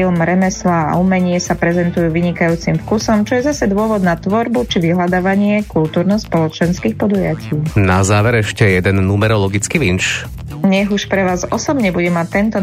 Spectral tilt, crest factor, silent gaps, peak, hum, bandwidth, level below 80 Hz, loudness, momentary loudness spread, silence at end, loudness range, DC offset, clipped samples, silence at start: -6 dB/octave; 14 dB; none; 0 dBFS; none; 15 kHz; -36 dBFS; -15 LUFS; 4 LU; 0 s; 1 LU; under 0.1%; under 0.1%; 0 s